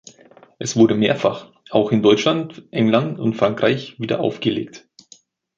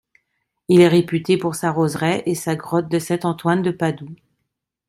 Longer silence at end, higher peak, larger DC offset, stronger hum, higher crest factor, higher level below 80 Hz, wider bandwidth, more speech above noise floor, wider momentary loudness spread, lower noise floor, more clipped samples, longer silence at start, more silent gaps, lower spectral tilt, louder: about the same, 0.8 s vs 0.75 s; about the same, -2 dBFS vs -2 dBFS; neither; neither; about the same, 18 dB vs 18 dB; about the same, -58 dBFS vs -60 dBFS; second, 7.8 kHz vs 15 kHz; second, 33 dB vs 59 dB; about the same, 11 LU vs 10 LU; second, -52 dBFS vs -77 dBFS; neither; about the same, 0.6 s vs 0.7 s; neither; about the same, -5.5 dB/octave vs -6 dB/octave; about the same, -19 LUFS vs -19 LUFS